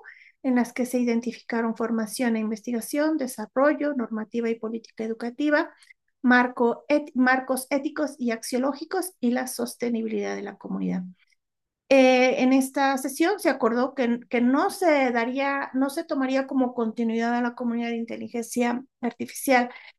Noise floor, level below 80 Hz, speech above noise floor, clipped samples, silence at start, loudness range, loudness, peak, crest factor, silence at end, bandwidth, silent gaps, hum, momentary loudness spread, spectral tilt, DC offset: -85 dBFS; -76 dBFS; 61 dB; under 0.1%; 0.05 s; 5 LU; -25 LUFS; -6 dBFS; 18 dB; 0.1 s; 12.5 kHz; none; none; 10 LU; -4.5 dB/octave; under 0.1%